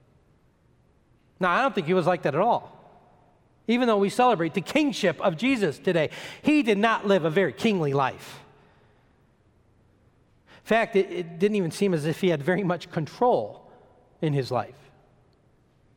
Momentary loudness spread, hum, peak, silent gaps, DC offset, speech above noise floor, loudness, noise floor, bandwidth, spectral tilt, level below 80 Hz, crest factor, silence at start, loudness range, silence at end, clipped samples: 8 LU; none; -8 dBFS; none; under 0.1%; 38 dB; -24 LUFS; -62 dBFS; 16.5 kHz; -6 dB/octave; -66 dBFS; 18 dB; 1.4 s; 6 LU; 1.25 s; under 0.1%